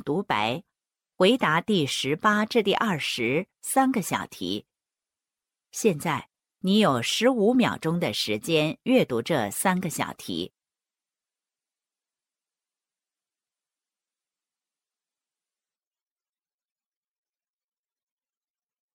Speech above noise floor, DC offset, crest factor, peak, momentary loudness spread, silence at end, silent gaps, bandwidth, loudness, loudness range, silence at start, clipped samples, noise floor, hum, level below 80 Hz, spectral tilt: over 66 dB; under 0.1%; 18 dB; -8 dBFS; 11 LU; 8.45 s; none; 17 kHz; -25 LUFS; 7 LU; 0.05 s; under 0.1%; under -90 dBFS; none; -68 dBFS; -4.5 dB/octave